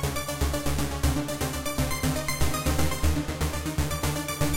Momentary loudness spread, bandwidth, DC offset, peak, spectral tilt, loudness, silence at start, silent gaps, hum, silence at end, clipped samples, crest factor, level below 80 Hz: 3 LU; 17 kHz; under 0.1%; -12 dBFS; -4.5 dB/octave; -28 LUFS; 0 s; none; none; 0 s; under 0.1%; 16 dB; -32 dBFS